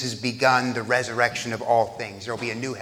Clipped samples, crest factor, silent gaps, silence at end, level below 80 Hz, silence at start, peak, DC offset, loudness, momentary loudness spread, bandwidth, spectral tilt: under 0.1%; 20 dB; none; 0 s; -64 dBFS; 0 s; -4 dBFS; under 0.1%; -24 LUFS; 10 LU; 16.5 kHz; -4 dB/octave